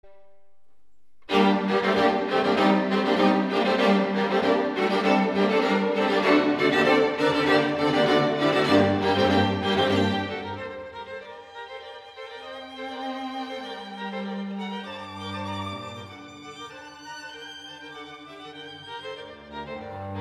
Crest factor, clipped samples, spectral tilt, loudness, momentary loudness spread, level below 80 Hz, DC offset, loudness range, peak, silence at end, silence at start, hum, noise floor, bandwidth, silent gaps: 18 dB; under 0.1%; -6 dB/octave; -23 LUFS; 19 LU; -62 dBFS; under 0.1%; 16 LU; -6 dBFS; 0 s; 0.05 s; none; -73 dBFS; 13 kHz; none